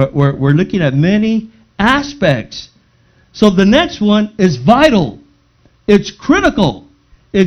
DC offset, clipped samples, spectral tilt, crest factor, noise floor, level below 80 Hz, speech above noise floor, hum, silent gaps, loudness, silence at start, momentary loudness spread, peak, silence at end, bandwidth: under 0.1%; 0.3%; -6.5 dB/octave; 12 dB; -52 dBFS; -36 dBFS; 40 dB; none; none; -12 LUFS; 0 s; 10 LU; 0 dBFS; 0 s; 9 kHz